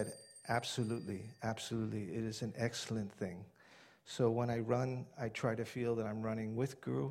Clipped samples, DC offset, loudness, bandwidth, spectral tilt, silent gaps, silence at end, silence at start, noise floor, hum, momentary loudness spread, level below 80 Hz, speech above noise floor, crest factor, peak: under 0.1%; under 0.1%; -39 LUFS; 14.5 kHz; -6 dB/octave; none; 0 s; 0 s; -63 dBFS; none; 9 LU; -70 dBFS; 25 dB; 18 dB; -20 dBFS